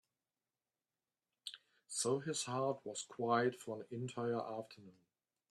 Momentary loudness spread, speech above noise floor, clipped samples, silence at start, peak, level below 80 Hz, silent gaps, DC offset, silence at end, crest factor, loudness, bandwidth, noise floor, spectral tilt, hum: 16 LU; over 50 dB; under 0.1%; 1.45 s; -22 dBFS; -86 dBFS; none; under 0.1%; 0.6 s; 20 dB; -40 LUFS; 13 kHz; under -90 dBFS; -4 dB/octave; none